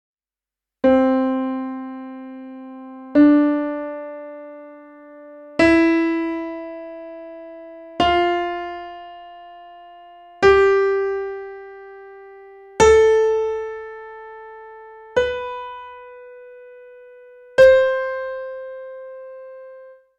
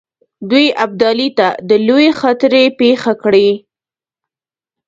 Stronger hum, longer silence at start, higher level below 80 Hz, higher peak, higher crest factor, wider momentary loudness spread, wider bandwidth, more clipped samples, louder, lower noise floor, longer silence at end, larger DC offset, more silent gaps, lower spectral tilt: neither; first, 0.85 s vs 0.4 s; first, -46 dBFS vs -58 dBFS; about the same, -2 dBFS vs 0 dBFS; first, 18 dB vs 12 dB; first, 26 LU vs 5 LU; first, 9.4 kHz vs 7.8 kHz; neither; second, -18 LUFS vs -12 LUFS; about the same, under -90 dBFS vs under -90 dBFS; second, 0.25 s vs 1.3 s; neither; neither; about the same, -5 dB/octave vs -5.5 dB/octave